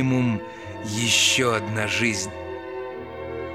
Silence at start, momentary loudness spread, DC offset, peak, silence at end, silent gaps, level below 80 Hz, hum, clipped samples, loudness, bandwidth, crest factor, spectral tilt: 0 s; 17 LU; 0.1%; -6 dBFS; 0 s; none; -54 dBFS; none; under 0.1%; -22 LUFS; 15 kHz; 18 dB; -3 dB/octave